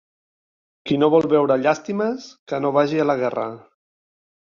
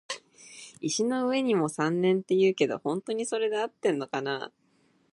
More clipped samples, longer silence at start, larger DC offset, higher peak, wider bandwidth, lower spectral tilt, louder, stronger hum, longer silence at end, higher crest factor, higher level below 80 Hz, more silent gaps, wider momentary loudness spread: neither; first, 0.85 s vs 0.1 s; neither; first, -4 dBFS vs -10 dBFS; second, 7.2 kHz vs 11.5 kHz; first, -6.5 dB/octave vs -4.5 dB/octave; first, -20 LUFS vs -28 LUFS; neither; first, 0.95 s vs 0.65 s; about the same, 18 dB vs 18 dB; first, -64 dBFS vs -78 dBFS; first, 2.39-2.47 s vs none; about the same, 13 LU vs 14 LU